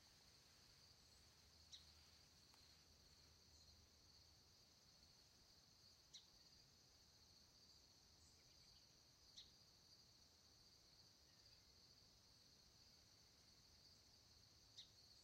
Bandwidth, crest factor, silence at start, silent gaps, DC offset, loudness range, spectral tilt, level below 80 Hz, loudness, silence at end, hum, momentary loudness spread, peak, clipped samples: 16 kHz; 22 dB; 0 s; none; under 0.1%; 1 LU; -2 dB/octave; -84 dBFS; -68 LUFS; 0 s; none; 5 LU; -50 dBFS; under 0.1%